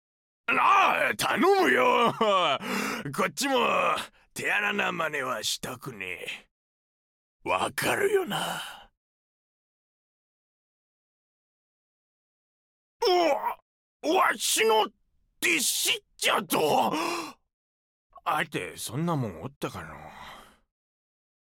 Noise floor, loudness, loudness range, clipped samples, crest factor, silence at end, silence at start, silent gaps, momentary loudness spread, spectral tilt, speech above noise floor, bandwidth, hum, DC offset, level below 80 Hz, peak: under -90 dBFS; -26 LUFS; 10 LU; under 0.1%; 18 dB; 1.05 s; 0.5 s; 6.51-7.40 s, 8.97-13.00 s, 13.62-14.00 s, 17.53-18.10 s, 19.56-19.61 s; 15 LU; -3 dB/octave; over 64 dB; 17 kHz; none; under 0.1%; -66 dBFS; -10 dBFS